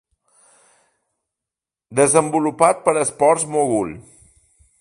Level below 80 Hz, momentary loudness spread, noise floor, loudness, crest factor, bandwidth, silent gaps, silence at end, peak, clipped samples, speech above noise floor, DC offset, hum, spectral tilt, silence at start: -58 dBFS; 10 LU; -88 dBFS; -18 LUFS; 20 dB; 11.5 kHz; none; 0.8 s; 0 dBFS; under 0.1%; 70 dB; under 0.1%; none; -4.5 dB/octave; 1.9 s